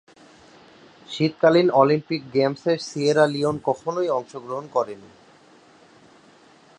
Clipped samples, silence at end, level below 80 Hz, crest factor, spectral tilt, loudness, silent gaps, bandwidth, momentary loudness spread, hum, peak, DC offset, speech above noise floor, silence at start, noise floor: under 0.1%; 1.8 s; -66 dBFS; 22 dB; -6 dB/octave; -22 LUFS; none; 11 kHz; 14 LU; none; -2 dBFS; under 0.1%; 31 dB; 1.1 s; -52 dBFS